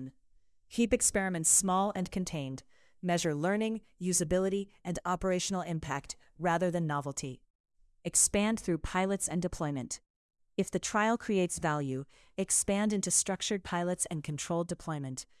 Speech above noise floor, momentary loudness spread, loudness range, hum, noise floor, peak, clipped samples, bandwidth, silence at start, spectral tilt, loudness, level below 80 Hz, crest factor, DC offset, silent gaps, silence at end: 36 dB; 13 LU; 3 LU; none; -68 dBFS; -12 dBFS; under 0.1%; 12 kHz; 0 s; -4 dB/octave; -31 LUFS; -56 dBFS; 20 dB; under 0.1%; 7.50-7.64 s, 10.10-10.29 s; 0.15 s